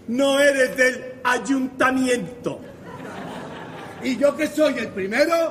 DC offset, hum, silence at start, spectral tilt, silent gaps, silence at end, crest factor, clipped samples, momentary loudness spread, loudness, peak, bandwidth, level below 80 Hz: under 0.1%; none; 0 s; -4 dB/octave; none; 0 s; 16 dB; under 0.1%; 18 LU; -21 LUFS; -4 dBFS; 15.5 kHz; -60 dBFS